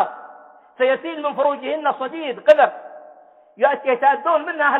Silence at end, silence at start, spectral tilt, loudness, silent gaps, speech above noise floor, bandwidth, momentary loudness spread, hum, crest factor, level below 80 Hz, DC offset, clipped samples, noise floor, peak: 0 s; 0 s; -5 dB/octave; -19 LUFS; none; 30 dB; 6.8 kHz; 11 LU; none; 18 dB; -76 dBFS; under 0.1%; under 0.1%; -48 dBFS; -2 dBFS